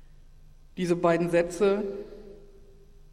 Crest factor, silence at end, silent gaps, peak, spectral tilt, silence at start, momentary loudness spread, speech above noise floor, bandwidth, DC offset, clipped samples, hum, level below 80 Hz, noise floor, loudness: 18 dB; 0.5 s; none; -10 dBFS; -6.5 dB/octave; 0.45 s; 21 LU; 26 dB; 13.5 kHz; under 0.1%; under 0.1%; none; -52 dBFS; -51 dBFS; -26 LUFS